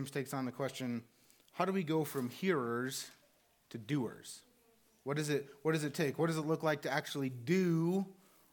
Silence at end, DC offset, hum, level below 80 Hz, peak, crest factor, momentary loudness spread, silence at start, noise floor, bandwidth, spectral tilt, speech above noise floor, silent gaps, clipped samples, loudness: 0.4 s; under 0.1%; none; -86 dBFS; -18 dBFS; 20 dB; 14 LU; 0 s; -71 dBFS; 19 kHz; -5.5 dB/octave; 35 dB; none; under 0.1%; -36 LUFS